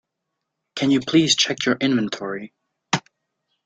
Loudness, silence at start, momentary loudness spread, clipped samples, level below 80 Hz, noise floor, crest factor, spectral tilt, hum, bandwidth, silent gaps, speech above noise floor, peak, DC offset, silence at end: -20 LUFS; 0.75 s; 13 LU; under 0.1%; -62 dBFS; -80 dBFS; 20 dB; -3.5 dB/octave; none; 9.4 kHz; none; 60 dB; -2 dBFS; under 0.1%; 0.65 s